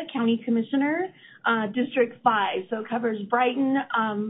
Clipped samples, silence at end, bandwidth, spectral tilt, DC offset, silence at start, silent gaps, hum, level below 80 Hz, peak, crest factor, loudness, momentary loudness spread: under 0.1%; 0 s; 4 kHz; -10 dB/octave; under 0.1%; 0 s; none; none; -76 dBFS; -8 dBFS; 18 dB; -25 LUFS; 7 LU